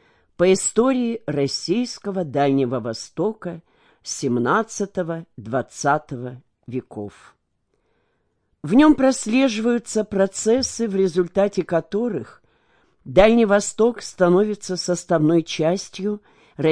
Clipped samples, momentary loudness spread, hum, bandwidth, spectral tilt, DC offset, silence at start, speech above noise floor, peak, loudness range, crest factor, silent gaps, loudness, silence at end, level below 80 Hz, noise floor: under 0.1%; 16 LU; none; 10.5 kHz; -5 dB/octave; under 0.1%; 0.4 s; 50 dB; -2 dBFS; 7 LU; 18 dB; none; -20 LUFS; 0 s; -48 dBFS; -70 dBFS